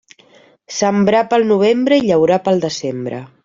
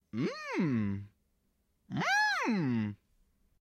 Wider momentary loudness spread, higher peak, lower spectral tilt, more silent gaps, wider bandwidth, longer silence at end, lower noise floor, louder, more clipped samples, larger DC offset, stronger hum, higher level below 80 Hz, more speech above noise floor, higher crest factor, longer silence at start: about the same, 11 LU vs 11 LU; first, -2 dBFS vs -20 dBFS; about the same, -5.5 dB/octave vs -5.5 dB/octave; neither; second, 7.6 kHz vs 13.5 kHz; second, 0.2 s vs 0.65 s; second, -49 dBFS vs -76 dBFS; first, -15 LUFS vs -32 LUFS; neither; neither; neither; first, -56 dBFS vs -70 dBFS; second, 34 dB vs 44 dB; about the same, 14 dB vs 14 dB; first, 0.7 s vs 0.15 s